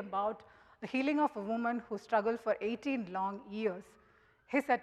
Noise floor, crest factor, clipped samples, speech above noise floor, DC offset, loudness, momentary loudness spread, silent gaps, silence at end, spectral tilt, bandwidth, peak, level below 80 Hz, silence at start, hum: -66 dBFS; 18 dB; under 0.1%; 32 dB; under 0.1%; -35 LUFS; 7 LU; none; 0 s; -6 dB/octave; 13 kHz; -16 dBFS; -74 dBFS; 0 s; none